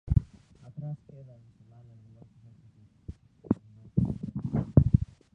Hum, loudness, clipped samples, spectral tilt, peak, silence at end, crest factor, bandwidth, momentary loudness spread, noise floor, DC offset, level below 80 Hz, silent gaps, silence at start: none; -29 LUFS; under 0.1%; -12 dB/octave; -6 dBFS; 0.3 s; 24 dB; 3.1 kHz; 27 LU; -58 dBFS; under 0.1%; -40 dBFS; none; 0.05 s